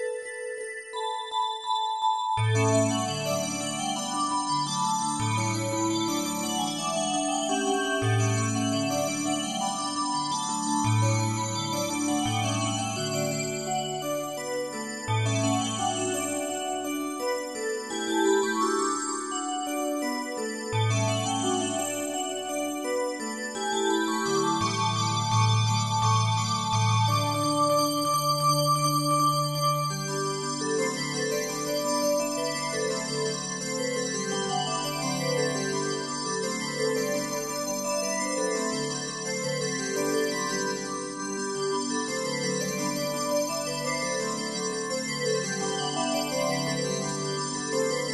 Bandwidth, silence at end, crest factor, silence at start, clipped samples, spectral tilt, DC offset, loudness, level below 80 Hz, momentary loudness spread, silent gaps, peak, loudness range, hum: 12.5 kHz; 0 s; 16 dB; 0 s; under 0.1%; -4 dB/octave; under 0.1%; -27 LUFS; -64 dBFS; 7 LU; none; -12 dBFS; 4 LU; none